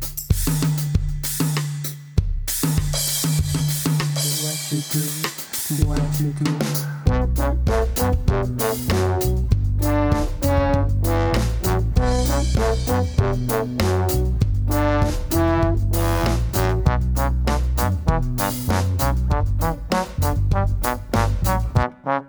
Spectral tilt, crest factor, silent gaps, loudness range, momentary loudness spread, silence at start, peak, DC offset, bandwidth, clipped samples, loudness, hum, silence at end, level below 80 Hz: -5.5 dB/octave; 16 dB; none; 2 LU; 4 LU; 0 s; -4 dBFS; under 0.1%; over 20 kHz; under 0.1%; -21 LUFS; none; 0 s; -24 dBFS